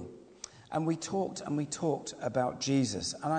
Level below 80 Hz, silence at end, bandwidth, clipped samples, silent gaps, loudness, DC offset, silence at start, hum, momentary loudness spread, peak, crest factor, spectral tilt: -66 dBFS; 0 s; 9.4 kHz; under 0.1%; none; -33 LUFS; under 0.1%; 0 s; none; 17 LU; -16 dBFS; 16 dB; -5 dB/octave